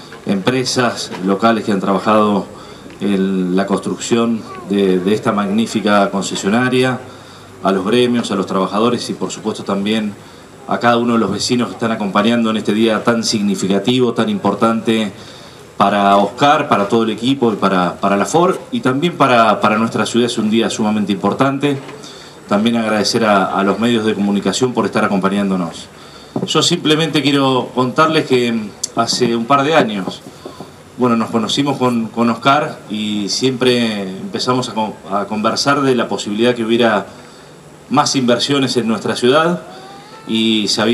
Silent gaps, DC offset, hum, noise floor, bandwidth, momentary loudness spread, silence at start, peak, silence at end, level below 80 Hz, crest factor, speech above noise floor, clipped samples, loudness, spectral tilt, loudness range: none; under 0.1%; none; -39 dBFS; 13.5 kHz; 10 LU; 0 s; 0 dBFS; 0 s; -56 dBFS; 16 dB; 24 dB; under 0.1%; -15 LUFS; -4.5 dB/octave; 3 LU